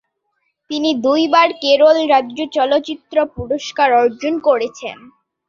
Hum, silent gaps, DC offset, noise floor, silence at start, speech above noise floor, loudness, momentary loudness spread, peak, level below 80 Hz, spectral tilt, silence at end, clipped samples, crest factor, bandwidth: none; none; under 0.1%; -69 dBFS; 0.7 s; 54 dB; -15 LUFS; 11 LU; -2 dBFS; -50 dBFS; -4 dB/octave; 0.55 s; under 0.1%; 16 dB; 7.4 kHz